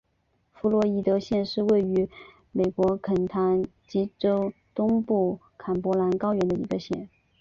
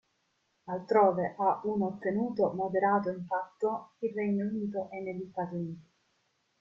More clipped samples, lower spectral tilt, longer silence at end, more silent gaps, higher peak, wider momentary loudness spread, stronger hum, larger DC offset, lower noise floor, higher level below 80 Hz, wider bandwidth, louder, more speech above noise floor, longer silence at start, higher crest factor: neither; about the same, -8.5 dB/octave vs -9.5 dB/octave; second, 0.35 s vs 0.8 s; neither; about the same, -12 dBFS vs -12 dBFS; second, 8 LU vs 12 LU; neither; neither; second, -71 dBFS vs -76 dBFS; first, -56 dBFS vs -72 dBFS; about the same, 7.4 kHz vs 7.2 kHz; first, -26 LUFS vs -31 LUFS; about the same, 46 dB vs 45 dB; about the same, 0.65 s vs 0.65 s; second, 14 dB vs 20 dB